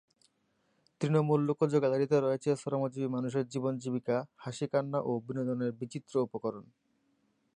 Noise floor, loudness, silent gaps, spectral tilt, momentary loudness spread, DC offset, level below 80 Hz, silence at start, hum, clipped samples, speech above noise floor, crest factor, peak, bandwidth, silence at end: -75 dBFS; -32 LUFS; none; -7.5 dB/octave; 9 LU; under 0.1%; -78 dBFS; 1 s; none; under 0.1%; 44 dB; 18 dB; -14 dBFS; 10.5 kHz; 0.95 s